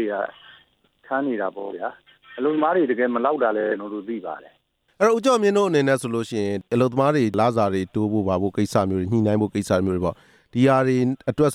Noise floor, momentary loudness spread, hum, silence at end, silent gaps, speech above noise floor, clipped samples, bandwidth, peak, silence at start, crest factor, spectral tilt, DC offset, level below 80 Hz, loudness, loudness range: -58 dBFS; 12 LU; none; 0 s; none; 37 dB; under 0.1%; 14.5 kHz; -6 dBFS; 0 s; 16 dB; -6.5 dB/octave; under 0.1%; -60 dBFS; -22 LUFS; 3 LU